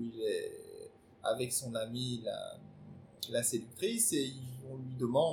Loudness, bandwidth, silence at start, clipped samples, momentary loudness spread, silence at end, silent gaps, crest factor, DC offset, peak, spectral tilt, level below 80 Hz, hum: -36 LUFS; 19 kHz; 0 s; under 0.1%; 21 LU; 0 s; none; 18 dB; under 0.1%; -18 dBFS; -3.5 dB/octave; -74 dBFS; none